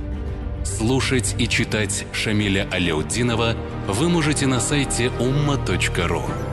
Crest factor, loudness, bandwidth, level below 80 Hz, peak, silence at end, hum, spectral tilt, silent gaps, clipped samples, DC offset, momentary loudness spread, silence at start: 14 dB; -21 LUFS; 12.5 kHz; -32 dBFS; -8 dBFS; 0 s; none; -4.5 dB/octave; none; under 0.1%; under 0.1%; 6 LU; 0 s